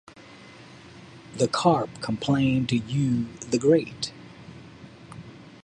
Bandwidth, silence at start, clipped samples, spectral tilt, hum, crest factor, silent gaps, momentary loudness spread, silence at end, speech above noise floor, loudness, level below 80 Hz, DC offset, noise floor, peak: 10.5 kHz; 0.15 s; under 0.1%; -6 dB/octave; none; 20 dB; none; 25 LU; 0.15 s; 24 dB; -25 LUFS; -56 dBFS; under 0.1%; -47 dBFS; -6 dBFS